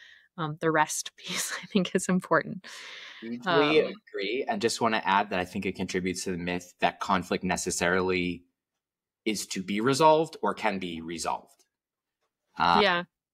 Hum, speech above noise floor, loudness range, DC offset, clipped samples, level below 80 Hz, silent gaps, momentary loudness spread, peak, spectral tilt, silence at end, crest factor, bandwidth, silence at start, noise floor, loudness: none; 62 dB; 2 LU; under 0.1%; under 0.1%; -62 dBFS; none; 13 LU; -8 dBFS; -4 dB/octave; 0.3 s; 22 dB; 16 kHz; 0.35 s; -89 dBFS; -27 LUFS